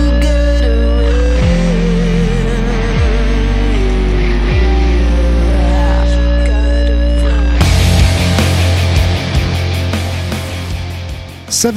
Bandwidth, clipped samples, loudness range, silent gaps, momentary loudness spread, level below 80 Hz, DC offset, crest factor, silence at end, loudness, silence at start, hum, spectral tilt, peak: 14 kHz; under 0.1%; 2 LU; none; 6 LU; -12 dBFS; under 0.1%; 10 dB; 0 s; -13 LUFS; 0 s; none; -5.5 dB/octave; 0 dBFS